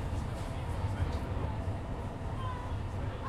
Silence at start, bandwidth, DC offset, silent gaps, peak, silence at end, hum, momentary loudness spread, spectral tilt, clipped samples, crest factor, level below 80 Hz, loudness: 0 s; 12.5 kHz; under 0.1%; none; -20 dBFS; 0 s; none; 4 LU; -7 dB/octave; under 0.1%; 14 dB; -42 dBFS; -37 LUFS